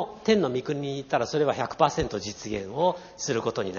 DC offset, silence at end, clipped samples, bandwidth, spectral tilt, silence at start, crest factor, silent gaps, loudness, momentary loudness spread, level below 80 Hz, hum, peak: under 0.1%; 0 s; under 0.1%; 7.2 kHz; -4.5 dB/octave; 0 s; 20 dB; none; -27 LUFS; 9 LU; -52 dBFS; none; -6 dBFS